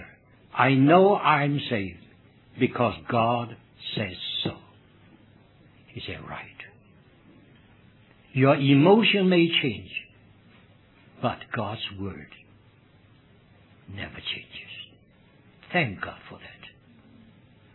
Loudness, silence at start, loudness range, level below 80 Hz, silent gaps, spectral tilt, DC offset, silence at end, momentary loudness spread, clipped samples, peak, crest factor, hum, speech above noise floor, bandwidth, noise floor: -24 LUFS; 0 s; 17 LU; -62 dBFS; none; -9.5 dB/octave; under 0.1%; 1.05 s; 25 LU; under 0.1%; -4 dBFS; 22 dB; none; 34 dB; 4.3 kHz; -57 dBFS